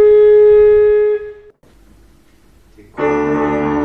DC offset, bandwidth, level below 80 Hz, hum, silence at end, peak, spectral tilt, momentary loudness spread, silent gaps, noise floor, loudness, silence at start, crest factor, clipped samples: 0.2%; 6 kHz; -40 dBFS; none; 0 s; -2 dBFS; -8 dB/octave; 13 LU; none; -49 dBFS; -11 LUFS; 0 s; 10 dB; under 0.1%